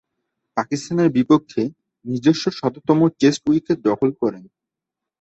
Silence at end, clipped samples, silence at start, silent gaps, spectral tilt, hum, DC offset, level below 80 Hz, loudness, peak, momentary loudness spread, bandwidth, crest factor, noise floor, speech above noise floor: 0.8 s; under 0.1%; 0.55 s; none; -6.5 dB/octave; none; under 0.1%; -60 dBFS; -20 LUFS; -2 dBFS; 10 LU; 8.2 kHz; 18 dB; -85 dBFS; 67 dB